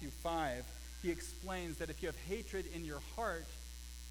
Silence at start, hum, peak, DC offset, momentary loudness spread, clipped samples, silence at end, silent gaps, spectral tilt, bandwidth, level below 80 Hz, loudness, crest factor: 0 s; none; -26 dBFS; under 0.1%; 11 LU; under 0.1%; 0 s; none; -4.5 dB/octave; 19.5 kHz; -50 dBFS; -43 LUFS; 16 dB